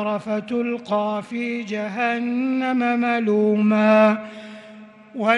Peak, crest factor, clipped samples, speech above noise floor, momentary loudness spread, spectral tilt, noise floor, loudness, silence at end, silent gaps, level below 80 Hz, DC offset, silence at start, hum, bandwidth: -2 dBFS; 18 dB; under 0.1%; 23 dB; 14 LU; -7 dB/octave; -43 dBFS; -21 LUFS; 0 s; none; -72 dBFS; under 0.1%; 0 s; none; 9.4 kHz